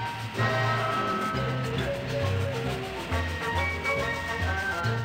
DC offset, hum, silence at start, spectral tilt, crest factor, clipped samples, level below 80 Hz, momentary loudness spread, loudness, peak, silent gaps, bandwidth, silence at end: under 0.1%; none; 0 s; -5.5 dB/octave; 14 dB; under 0.1%; -44 dBFS; 5 LU; -28 LUFS; -14 dBFS; none; 16 kHz; 0 s